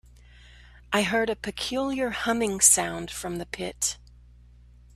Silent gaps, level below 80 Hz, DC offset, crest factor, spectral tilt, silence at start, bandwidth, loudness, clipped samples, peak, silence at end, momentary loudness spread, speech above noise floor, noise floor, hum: none; -52 dBFS; under 0.1%; 24 dB; -2 dB/octave; 0.55 s; 15.5 kHz; -25 LUFS; under 0.1%; -4 dBFS; 1 s; 15 LU; 26 dB; -52 dBFS; 60 Hz at -50 dBFS